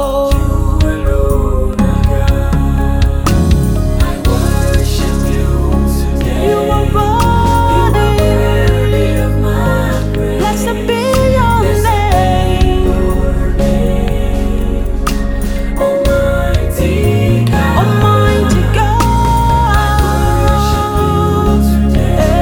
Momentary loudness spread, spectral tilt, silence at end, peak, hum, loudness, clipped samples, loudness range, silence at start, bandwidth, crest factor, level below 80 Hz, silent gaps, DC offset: 4 LU; -6.5 dB/octave; 0 s; 0 dBFS; none; -12 LUFS; under 0.1%; 3 LU; 0 s; 19 kHz; 10 dB; -14 dBFS; none; under 0.1%